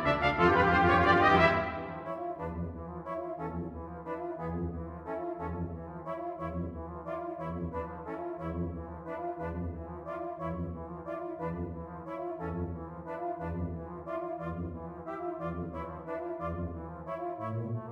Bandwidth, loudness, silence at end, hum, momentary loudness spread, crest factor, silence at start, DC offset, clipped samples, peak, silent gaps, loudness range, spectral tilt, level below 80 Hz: 7.8 kHz; -34 LUFS; 0 s; none; 16 LU; 22 dB; 0 s; under 0.1%; under 0.1%; -12 dBFS; none; 10 LU; -7.5 dB/octave; -50 dBFS